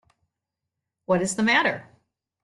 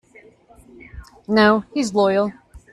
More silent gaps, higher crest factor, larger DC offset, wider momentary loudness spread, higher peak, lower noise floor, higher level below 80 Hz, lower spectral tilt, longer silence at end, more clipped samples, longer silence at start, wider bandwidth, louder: neither; about the same, 20 dB vs 18 dB; neither; first, 17 LU vs 10 LU; second, -8 dBFS vs -4 dBFS; first, -85 dBFS vs -49 dBFS; second, -66 dBFS vs -48 dBFS; about the same, -4 dB/octave vs -5 dB/octave; first, 0.6 s vs 0.15 s; neither; first, 1.1 s vs 0.95 s; about the same, 12 kHz vs 11 kHz; second, -22 LUFS vs -18 LUFS